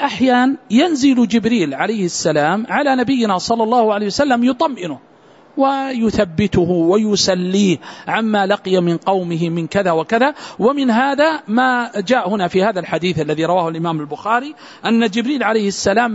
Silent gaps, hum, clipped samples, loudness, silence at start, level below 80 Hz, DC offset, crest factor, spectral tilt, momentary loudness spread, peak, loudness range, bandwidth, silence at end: none; none; under 0.1%; -16 LUFS; 0 s; -48 dBFS; under 0.1%; 14 dB; -5 dB/octave; 5 LU; -2 dBFS; 2 LU; 8 kHz; 0 s